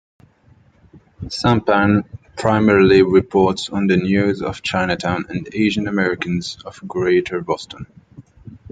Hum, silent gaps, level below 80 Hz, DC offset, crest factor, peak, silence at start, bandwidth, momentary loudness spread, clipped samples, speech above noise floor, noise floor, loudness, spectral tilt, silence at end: none; none; -48 dBFS; under 0.1%; 18 dB; -2 dBFS; 0.95 s; 9.2 kHz; 16 LU; under 0.1%; 35 dB; -52 dBFS; -17 LUFS; -6.5 dB/octave; 0.15 s